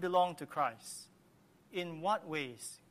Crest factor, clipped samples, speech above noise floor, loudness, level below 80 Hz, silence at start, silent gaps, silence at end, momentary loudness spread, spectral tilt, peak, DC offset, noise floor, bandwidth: 20 dB; under 0.1%; 30 dB; -38 LUFS; -82 dBFS; 0 s; none; 0.15 s; 15 LU; -4 dB/octave; -18 dBFS; under 0.1%; -66 dBFS; 15 kHz